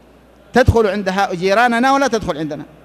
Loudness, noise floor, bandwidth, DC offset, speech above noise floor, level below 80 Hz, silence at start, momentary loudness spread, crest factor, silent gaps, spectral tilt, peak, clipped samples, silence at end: -15 LUFS; -46 dBFS; 14 kHz; under 0.1%; 31 dB; -32 dBFS; 0.55 s; 9 LU; 16 dB; none; -5.5 dB/octave; 0 dBFS; under 0.1%; 0.2 s